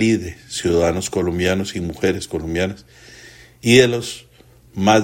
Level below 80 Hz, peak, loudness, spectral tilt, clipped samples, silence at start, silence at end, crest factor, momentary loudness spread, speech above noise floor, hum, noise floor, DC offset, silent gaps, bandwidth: -46 dBFS; 0 dBFS; -19 LUFS; -5 dB/octave; under 0.1%; 0 s; 0 s; 20 dB; 15 LU; 30 dB; none; -48 dBFS; under 0.1%; none; 16.5 kHz